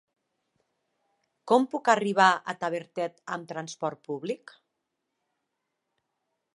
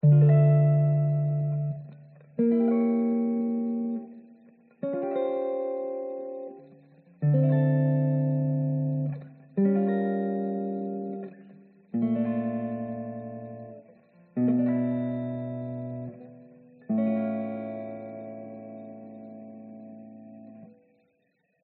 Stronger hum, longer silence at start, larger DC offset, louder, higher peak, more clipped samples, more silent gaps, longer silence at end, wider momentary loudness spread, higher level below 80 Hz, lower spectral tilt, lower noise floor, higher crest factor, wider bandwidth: neither; first, 1.45 s vs 0.05 s; neither; about the same, -27 LUFS vs -27 LUFS; first, -6 dBFS vs -12 dBFS; neither; neither; first, 2.2 s vs 0.95 s; second, 14 LU vs 21 LU; second, -84 dBFS vs -72 dBFS; second, -4.5 dB/octave vs -11.5 dB/octave; first, -82 dBFS vs -73 dBFS; first, 24 dB vs 16 dB; first, 11.5 kHz vs 3.8 kHz